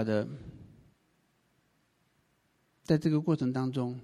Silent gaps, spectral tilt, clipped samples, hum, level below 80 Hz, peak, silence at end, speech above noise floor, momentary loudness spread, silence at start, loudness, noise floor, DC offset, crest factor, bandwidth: none; -8 dB/octave; under 0.1%; none; -64 dBFS; -14 dBFS; 0 s; 43 dB; 16 LU; 0 s; -30 LUFS; -72 dBFS; under 0.1%; 20 dB; 11.5 kHz